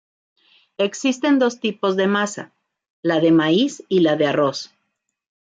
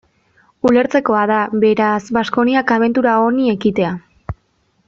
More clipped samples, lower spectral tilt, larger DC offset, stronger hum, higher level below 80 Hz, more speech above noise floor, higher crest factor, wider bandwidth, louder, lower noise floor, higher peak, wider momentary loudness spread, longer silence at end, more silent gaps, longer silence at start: neither; second, -5 dB/octave vs -6.5 dB/octave; neither; neither; second, -68 dBFS vs -46 dBFS; first, 57 dB vs 47 dB; about the same, 14 dB vs 14 dB; first, 9 kHz vs 7.4 kHz; second, -19 LUFS vs -15 LUFS; first, -75 dBFS vs -61 dBFS; second, -6 dBFS vs -2 dBFS; second, 10 LU vs 15 LU; first, 0.85 s vs 0.55 s; first, 2.90-3.03 s vs none; first, 0.8 s vs 0.65 s